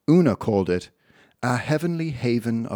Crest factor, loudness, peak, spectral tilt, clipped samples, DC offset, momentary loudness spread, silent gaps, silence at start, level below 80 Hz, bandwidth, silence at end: 16 dB; -23 LUFS; -6 dBFS; -7.5 dB/octave; under 0.1%; under 0.1%; 8 LU; none; 0.1 s; -56 dBFS; 18 kHz; 0 s